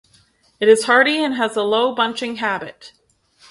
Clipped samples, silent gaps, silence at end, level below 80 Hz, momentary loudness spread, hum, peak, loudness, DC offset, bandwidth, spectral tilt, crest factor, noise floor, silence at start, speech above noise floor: under 0.1%; none; 0.6 s; -66 dBFS; 10 LU; none; 0 dBFS; -17 LUFS; under 0.1%; 11.5 kHz; -3 dB/octave; 18 dB; -56 dBFS; 0.6 s; 39 dB